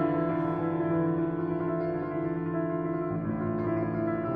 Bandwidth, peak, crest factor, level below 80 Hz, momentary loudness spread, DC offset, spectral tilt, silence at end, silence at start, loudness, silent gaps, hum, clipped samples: 4.6 kHz; -16 dBFS; 12 dB; -56 dBFS; 4 LU; under 0.1%; -12 dB/octave; 0 s; 0 s; -30 LUFS; none; none; under 0.1%